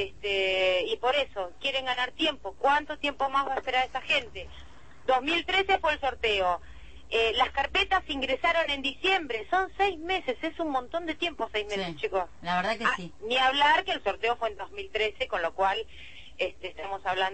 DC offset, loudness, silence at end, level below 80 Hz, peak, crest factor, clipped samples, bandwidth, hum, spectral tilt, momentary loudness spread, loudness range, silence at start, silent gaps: 0.5%; -28 LUFS; 0 s; -52 dBFS; -12 dBFS; 18 dB; under 0.1%; 8.8 kHz; none; -3.5 dB/octave; 9 LU; 4 LU; 0 s; none